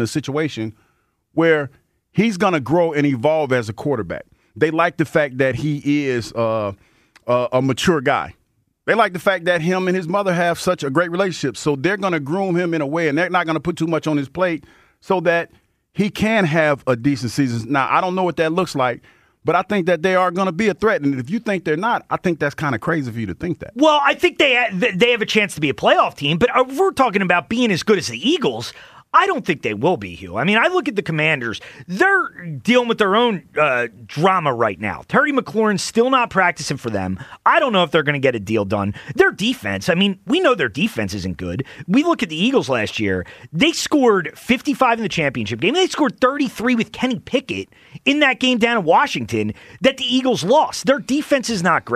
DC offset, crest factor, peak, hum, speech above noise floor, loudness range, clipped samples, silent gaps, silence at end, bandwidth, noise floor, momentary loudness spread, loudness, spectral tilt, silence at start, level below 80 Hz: under 0.1%; 16 dB; -2 dBFS; none; 46 dB; 3 LU; under 0.1%; none; 0 s; 15.5 kHz; -64 dBFS; 9 LU; -18 LUFS; -5 dB/octave; 0 s; -52 dBFS